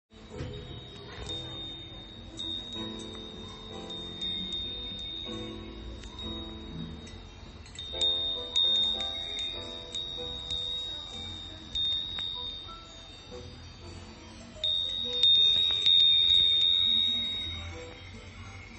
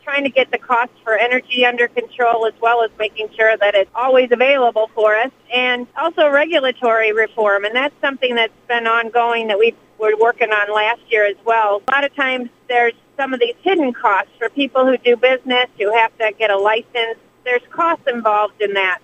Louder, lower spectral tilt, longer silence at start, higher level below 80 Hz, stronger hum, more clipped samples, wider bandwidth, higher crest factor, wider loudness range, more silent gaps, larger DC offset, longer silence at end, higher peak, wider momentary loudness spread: second, -26 LUFS vs -16 LUFS; about the same, -3 dB/octave vs -3.5 dB/octave; about the same, 0.15 s vs 0.05 s; first, -50 dBFS vs -66 dBFS; neither; neither; about the same, 8.4 kHz vs 8.4 kHz; about the same, 20 dB vs 16 dB; first, 16 LU vs 2 LU; neither; neither; about the same, 0 s vs 0.05 s; second, -12 dBFS vs 0 dBFS; first, 25 LU vs 5 LU